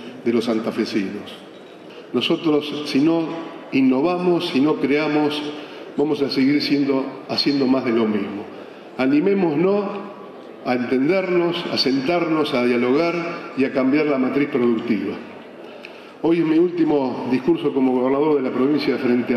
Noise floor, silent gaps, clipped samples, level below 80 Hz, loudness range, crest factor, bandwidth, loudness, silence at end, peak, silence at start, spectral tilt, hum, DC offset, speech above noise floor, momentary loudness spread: -39 dBFS; none; under 0.1%; -64 dBFS; 2 LU; 10 dB; 12.5 kHz; -20 LUFS; 0 s; -10 dBFS; 0 s; -6.5 dB/octave; none; under 0.1%; 20 dB; 16 LU